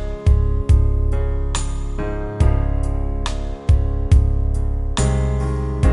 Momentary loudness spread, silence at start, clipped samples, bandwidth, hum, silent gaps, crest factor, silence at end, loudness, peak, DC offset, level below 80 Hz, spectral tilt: 9 LU; 0 s; under 0.1%; 11 kHz; none; none; 16 dB; 0 s; -20 LUFS; -2 dBFS; under 0.1%; -18 dBFS; -6.5 dB/octave